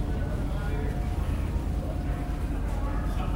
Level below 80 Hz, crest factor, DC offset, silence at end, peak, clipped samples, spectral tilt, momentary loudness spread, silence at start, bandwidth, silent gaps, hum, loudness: -30 dBFS; 12 dB; under 0.1%; 0 s; -16 dBFS; under 0.1%; -7.5 dB/octave; 1 LU; 0 s; 16 kHz; none; none; -31 LUFS